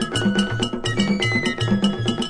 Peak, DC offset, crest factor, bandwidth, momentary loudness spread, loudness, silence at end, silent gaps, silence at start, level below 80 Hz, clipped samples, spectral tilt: -6 dBFS; under 0.1%; 16 dB; 10 kHz; 3 LU; -21 LUFS; 0 s; none; 0 s; -42 dBFS; under 0.1%; -5 dB/octave